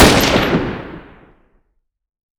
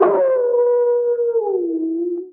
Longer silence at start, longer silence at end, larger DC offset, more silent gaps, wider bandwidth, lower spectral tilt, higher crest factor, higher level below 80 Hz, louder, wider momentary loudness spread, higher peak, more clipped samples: about the same, 0 s vs 0 s; first, 1.4 s vs 0 s; neither; neither; first, over 20 kHz vs 3 kHz; second, -4 dB/octave vs -11 dB/octave; about the same, 16 dB vs 14 dB; first, -28 dBFS vs -74 dBFS; first, -14 LUFS vs -18 LUFS; first, 23 LU vs 6 LU; first, 0 dBFS vs -4 dBFS; neither